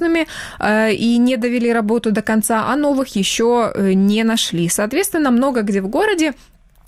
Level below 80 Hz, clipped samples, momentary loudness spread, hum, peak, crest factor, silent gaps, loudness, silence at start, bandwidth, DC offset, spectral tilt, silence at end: -48 dBFS; under 0.1%; 4 LU; none; -2 dBFS; 14 dB; none; -16 LUFS; 0 s; 16 kHz; under 0.1%; -4.5 dB/octave; 0.55 s